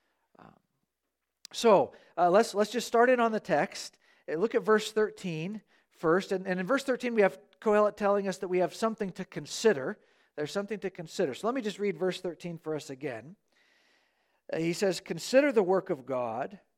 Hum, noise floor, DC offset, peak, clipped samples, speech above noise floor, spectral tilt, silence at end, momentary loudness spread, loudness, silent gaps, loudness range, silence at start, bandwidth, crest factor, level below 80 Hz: none; -85 dBFS; under 0.1%; -10 dBFS; under 0.1%; 56 dB; -5 dB/octave; 0.2 s; 14 LU; -29 LUFS; none; 8 LU; 1.55 s; 15.5 kHz; 20 dB; -74 dBFS